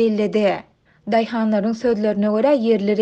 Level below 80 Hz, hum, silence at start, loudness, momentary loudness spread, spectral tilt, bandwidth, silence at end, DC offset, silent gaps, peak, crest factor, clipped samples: -58 dBFS; none; 0 s; -19 LUFS; 5 LU; -7.5 dB/octave; 8 kHz; 0 s; under 0.1%; none; -4 dBFS; 14 dB; under 0.1%